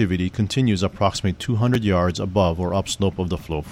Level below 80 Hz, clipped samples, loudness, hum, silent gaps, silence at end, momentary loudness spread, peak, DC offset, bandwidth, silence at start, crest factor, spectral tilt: -40 dBFS; under 0.1%; -22 LUFS; none; none; 0 s; 5 LU; -4 dBFS; under 0.1%; 15.5 kHz; 0 s; 16 dB; -6 dB/octave